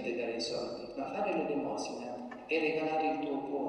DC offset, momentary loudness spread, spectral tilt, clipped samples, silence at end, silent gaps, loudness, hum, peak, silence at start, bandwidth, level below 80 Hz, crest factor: under 0.1%; 9 LU; -4.5 dB/octave; under 0.1%; 0 s; none; -35 LUFS; none; -20 dBFS; 0 s; 11 kHz; -70 dBFS; 14 dB